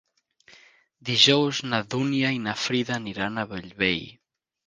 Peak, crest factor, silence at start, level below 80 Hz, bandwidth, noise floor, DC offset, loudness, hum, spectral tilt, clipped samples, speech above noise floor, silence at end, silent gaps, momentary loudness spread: -2 dBFS; 24 dB; 1.05 s; -60 dBFS; 9.8 kHz; -58 dBFS; under 0.1%; -24 LUFS; none; -4 dB/octave; under 0.1%; 33 dB; 0.55 s; none; 14 LU